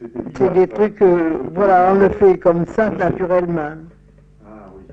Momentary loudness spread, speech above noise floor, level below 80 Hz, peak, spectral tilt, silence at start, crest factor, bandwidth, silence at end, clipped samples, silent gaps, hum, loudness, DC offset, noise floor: 9 LU; 32 dB; -44 dBFS; -2 dBFS; -9.5 dB/octave; 0 s; 14 dB; 7.2 kHz; 0 s; under 0.1%; none; none; -15 LUFS; under 0.1%; -47 dBFS